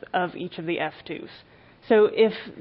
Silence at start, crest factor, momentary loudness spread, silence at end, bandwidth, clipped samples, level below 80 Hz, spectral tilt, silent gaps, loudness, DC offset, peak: 0.15 s; 18 dB; 17 LU; 0 s; 5.4 kHz; under 0.1%; -66 dBFS; -10 dB/octave; none; -24 LUFS; under 0.1%; -8 dBFS